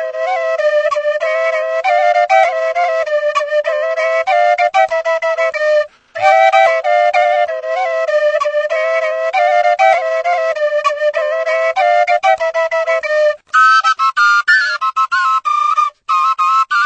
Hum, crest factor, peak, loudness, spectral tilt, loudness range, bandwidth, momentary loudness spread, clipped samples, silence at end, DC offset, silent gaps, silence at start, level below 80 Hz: none; 14 dB; 0 dBFS; -13 LUFS; 1 dB/octave; 2 LU; 8.6 kHz; 6 LU; under 0.1%; 0 s; under 0.1%; none; 0 s; -66 dBFS